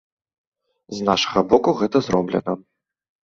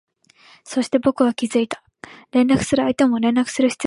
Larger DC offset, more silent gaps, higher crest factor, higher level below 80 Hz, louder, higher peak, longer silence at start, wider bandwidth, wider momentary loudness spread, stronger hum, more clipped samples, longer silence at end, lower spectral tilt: neither; neither; about the same, 20 dB vs 16 dB; about the same, -54 dBFS vs -52 dBFS; about the same, -20 LUFS vs -19 LUFS; about the same, -2 dBFS vs -4 dBFS; first, 0.9 s vs 0.65 s; second, 7.6 kHz vs 11.5 kHz; first, 12 LU vs 8 LU; neither; neither; first, 0.65 s vs 0 s; about the same, -5.5 dB/octave vs -5 dB/octave